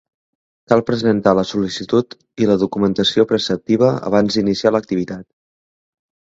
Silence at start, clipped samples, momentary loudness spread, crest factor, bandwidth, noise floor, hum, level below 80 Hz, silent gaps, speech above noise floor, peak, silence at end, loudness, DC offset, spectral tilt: 0.7 s; under 0.1%; 7 LU; 18 dB; 7.8 kHz; under -90 dBFS; none; -52 dBFS; none; over 74 dB; 0 dBFS; 1.2 s; -17 LUFS; under 0.1%; -6 dB/octave